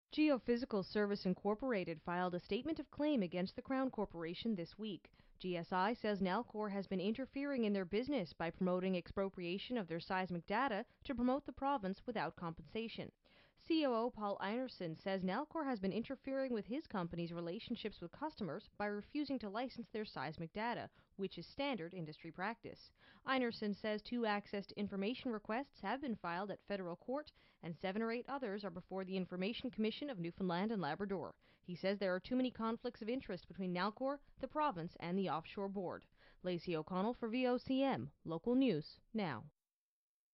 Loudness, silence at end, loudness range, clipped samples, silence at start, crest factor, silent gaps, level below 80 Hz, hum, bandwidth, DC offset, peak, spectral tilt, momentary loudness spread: -42 LUFS; 0.85 s; 4 LU; under 0.1%; 0.1 s; 18 dB; none; -70 dBFS; none; 5.8 kHz; under 0.1%; -24 dBFS; -4.5 dB/octave; 9 LU